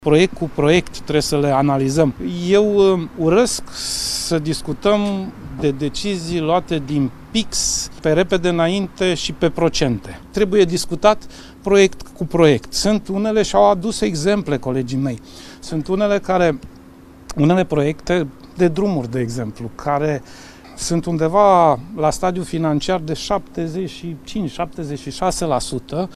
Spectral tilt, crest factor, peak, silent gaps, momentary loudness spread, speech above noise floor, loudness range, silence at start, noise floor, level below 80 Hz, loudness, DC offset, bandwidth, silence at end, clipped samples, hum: -5 dB/octave; 18 dB; 0 dBFS; none; 12 LU; 24 dB; 4 LU; 0 s; -42 dBFS; -38 dBFS; -18 LUFS; under 0.1%; 14.5 kHz; 0 s; under 0.1%; none